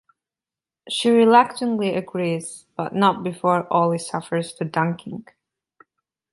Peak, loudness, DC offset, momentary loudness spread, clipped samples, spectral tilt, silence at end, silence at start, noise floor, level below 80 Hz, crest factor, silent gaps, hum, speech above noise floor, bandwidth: -2 dBFS; -21 LUFS; under 0.1%; 14 LU; under 0.1%; -5.5 dB/octave; 1.1 s; 0.85 s; under -90 dBFS; -68 dBFS; 20 dB; none; none; over 69 dB; 11.5 kHz